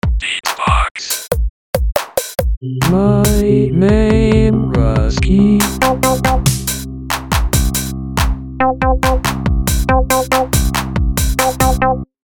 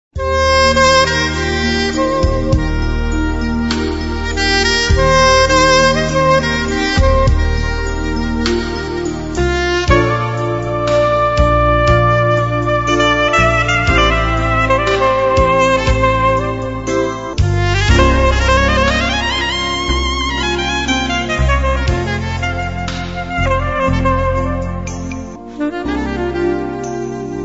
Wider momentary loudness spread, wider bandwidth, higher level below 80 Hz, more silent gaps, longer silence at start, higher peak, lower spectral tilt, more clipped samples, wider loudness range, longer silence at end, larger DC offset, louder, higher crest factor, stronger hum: about the same, 8 LU vs 9 LU; first, 17.5 kHz vs 8 kHz; about the same, -20 dBFS vs -22 dBFS; first, 0.91-0.95 s, 1.50-1.73 s, 2.57-2.61 s vs none; about the same, 0.05 s vs 0.15 s; about the same, 0 dBFS vs 0 dBFS; about the same, -5 dB/octave vs -5 dB/octave; neither; about the same, 4 LU vs 6 LU; first, 0.2 s vs 0 s; second, under 0.1% vs 0.5%; about the same, -15 LUFS vs -14 LUFS; about the same, 14 dB vs 14 dB; neither